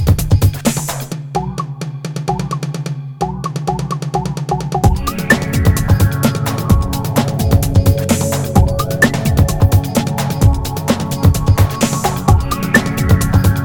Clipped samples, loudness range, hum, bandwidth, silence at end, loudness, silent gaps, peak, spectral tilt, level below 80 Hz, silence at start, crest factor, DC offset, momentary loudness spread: under 0.1%; 7 LU; none; 19 kHz; 0 s; -15 LUFS; none; 0 dBFS; -5.5 dB/octave; -22 dBFS; 0 s; 14 dB; under 0.1%; 9 LU